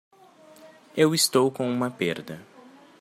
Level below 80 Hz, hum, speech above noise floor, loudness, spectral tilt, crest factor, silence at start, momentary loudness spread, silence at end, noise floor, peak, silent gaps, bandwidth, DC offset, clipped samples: -72 dBFS; none; 29 dB; -24 LUFS; -4 dB/octave; 20 dB; 0.65 s; 17 LU; 0.6 s; -52 dBFS; -6 dBFS; none; 16 kHz; under 0.1%; under 0.1%